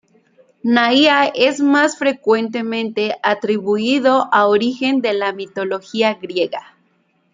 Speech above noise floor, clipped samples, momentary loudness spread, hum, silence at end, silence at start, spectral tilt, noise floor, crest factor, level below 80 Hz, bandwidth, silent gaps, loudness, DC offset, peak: 45 dB; under 0.1%; 9 LU; none; 0.75 s; 0.65 s; -4 dB/octave; -61 dBFS; 16 dB; -68 dBFS; 9.4 kHz; none; -16 LUFS; under 0.1%; -2 dBFS